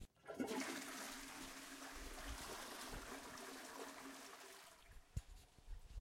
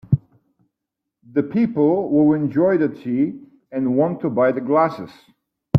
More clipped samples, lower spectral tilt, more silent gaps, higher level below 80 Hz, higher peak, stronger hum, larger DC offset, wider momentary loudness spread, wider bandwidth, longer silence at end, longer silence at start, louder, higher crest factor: neither; second, -3 dB/octave vs -10.5 dB/octave; neither; second, -62 dBFS vs -56 dBFS; second, -30 dBFS vs -2 dBFS; neither; neither; first, 14 LU vs 8 LU; first, 16.5 kHz vs 5.4 kHz; about the same, 0 s vs 0 s; about the same, 0 s vs 0.1 s; second, -51 LUFS vs -19 LUFS; about the same, 22 dB vs 18 dB